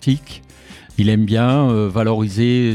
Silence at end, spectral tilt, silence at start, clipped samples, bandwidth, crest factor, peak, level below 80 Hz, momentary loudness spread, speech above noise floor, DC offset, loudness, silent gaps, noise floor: 0 s; -7.5 dB/octave; 0 s; under 0.1%; 11.5 kHz; 14 dB; -2 dBFS; -46 dBFS; 8 LU; 26 dB; under 0.1%; -17 LUFS; none; -41 dBFS